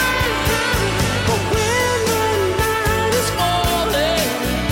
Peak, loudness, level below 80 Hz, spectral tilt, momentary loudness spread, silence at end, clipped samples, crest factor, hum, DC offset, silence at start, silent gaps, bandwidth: -6 dBFS; -18 LUFS; -30 dBFS; -3.5 dB/octave; 1 LU; 0 s; under 0.1%; 12 dB; none; under 0.1%; 0 s; none; 17 kHz